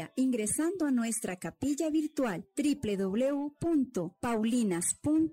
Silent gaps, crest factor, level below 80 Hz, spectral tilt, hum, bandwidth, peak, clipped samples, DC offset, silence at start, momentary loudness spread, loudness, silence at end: none; 10 dB; -62 dBFS; -4.5 dB/octave; none; 16 kHz; -20 dBFS; under 0.1%; under 0.1%; 0 s; 5 LU; -31 LUFS; 0 s